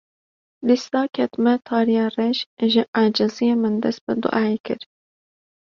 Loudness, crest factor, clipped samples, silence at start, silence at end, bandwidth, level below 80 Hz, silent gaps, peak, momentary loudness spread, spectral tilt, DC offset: -21 LUFS; 16 dB; under 0.1%; 0.6 s; 0.95 s; 7 kHz; -66 dBFS; 2.46-2.57 s, 2.88-2.93 s, 4.01-4.07 s, 4.60-4.64 s; -4 dBFS; 5 LU; -6 dB/octave; under 0.1%